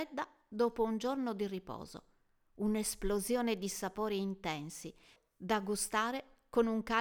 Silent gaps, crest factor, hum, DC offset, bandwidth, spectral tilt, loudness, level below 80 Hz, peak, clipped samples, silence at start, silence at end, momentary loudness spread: none; 18 dB; none; under 0.1%; over 20 kHz; -4 dB/octave; -36 LUFS; -56 dBFS; -18 dBFS; under 0.1%; 0 s; 0 s; 14 LU